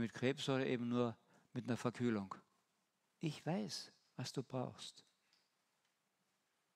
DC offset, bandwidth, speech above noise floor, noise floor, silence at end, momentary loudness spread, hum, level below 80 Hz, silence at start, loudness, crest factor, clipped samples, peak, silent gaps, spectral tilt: under 0.1%; 13.5 kHz; 43 dB; -84 dBFS; 1.75 s; 14 LU; none; -86 dBFS; 0 s; -43 LUFS; 22 dB; under 0.1%; -22 dBFS; none; -5.5 dB/octave